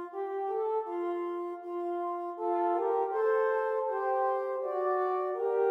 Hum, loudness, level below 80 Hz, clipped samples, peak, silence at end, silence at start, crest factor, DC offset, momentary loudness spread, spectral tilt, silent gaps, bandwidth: none; -31 LUFS; under -90 dBFS; under 0.1%; -18 dBFS; 0 s; 0 s; 12 dB; under 0.1%; 7 LU; -5 dB/octave; none; 5.6 kHz